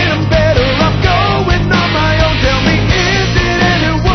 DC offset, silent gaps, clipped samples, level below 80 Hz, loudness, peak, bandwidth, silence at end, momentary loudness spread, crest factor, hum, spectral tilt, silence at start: 0.3%; none; under 0.1%; -20 dBFS; -11 LUFS; 0 dBFS; 6.4 kHz; 0 s; 1 LU; 10 dB; none; -5.5 dB/octave; 0 s